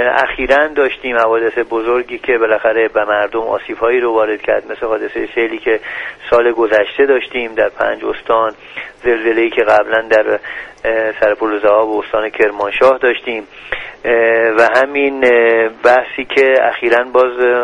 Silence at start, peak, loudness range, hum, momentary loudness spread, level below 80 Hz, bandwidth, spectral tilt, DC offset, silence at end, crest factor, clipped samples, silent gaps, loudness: 0 s; 0 dBFS; 3 LU; none; 9 LU; -46 dBFS; 9.4 kHz; -5 dB/octave; under 0.1%; 0 s; 14 dB; under 0.1%; none; -13 LUFS